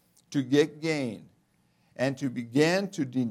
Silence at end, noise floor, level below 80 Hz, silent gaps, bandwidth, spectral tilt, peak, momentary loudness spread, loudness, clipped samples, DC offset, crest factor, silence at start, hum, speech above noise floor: 0 s; -68 dBFS; -76 dBFS; none; 15 kHz; -5.5 dB/octave; -10 dBFS; 9 LU; -28 LUFS; under 0.1%; under 0.1%; 18 dB; 0.3 s; none; 41 dB